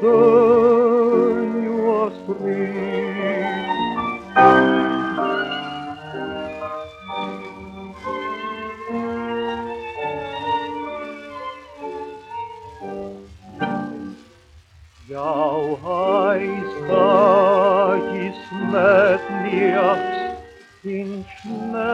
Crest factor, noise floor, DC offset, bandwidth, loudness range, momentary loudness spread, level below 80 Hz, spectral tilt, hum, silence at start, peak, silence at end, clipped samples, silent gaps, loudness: 18 dB; -49 dBFS; under 0.1%; 8 kHz; 13 LU; 19 LU; -56 dBFS; -7 dB/octave; none; 0 s; -2 dBFS; 0 s; under 0.1%; none; -20 LUFS